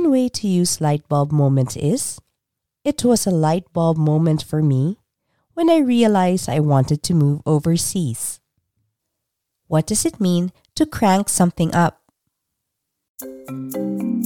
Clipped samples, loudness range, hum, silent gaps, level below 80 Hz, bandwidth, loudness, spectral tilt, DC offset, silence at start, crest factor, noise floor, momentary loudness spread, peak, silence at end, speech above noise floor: under 0.1%; 4 LU; none; 13.09-13.15 s; -50 dBFS; 18.5 kHz; -19 LUFS; -6 dB/octave; under 0.1%; 0 s; 16 dB; -80 dBFS; 11 LU; -4 dBFS; 0 s; 63 dB